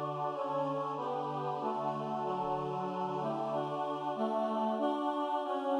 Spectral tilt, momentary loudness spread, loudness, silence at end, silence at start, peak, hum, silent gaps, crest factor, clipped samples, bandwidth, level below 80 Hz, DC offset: -7.5 dB/octave; 3 LU; -35 LUFS; 0 s; 0 s; -20 dBFS; none; none; 14 dB; under 0.1%; 11.5 kHz; -74 dBFS; under 0.1%